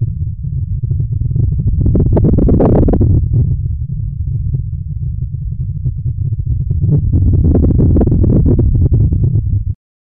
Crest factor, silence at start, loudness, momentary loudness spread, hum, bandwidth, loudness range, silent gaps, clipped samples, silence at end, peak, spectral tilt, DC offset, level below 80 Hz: 12 dB; 0 s; -14 LUFS; 10 LU; none; 2 kHz; 6 LU; none; under 0.1%; 0.3 s; -2 dBFS; -15 dB/octave; 1%; -18 dBFS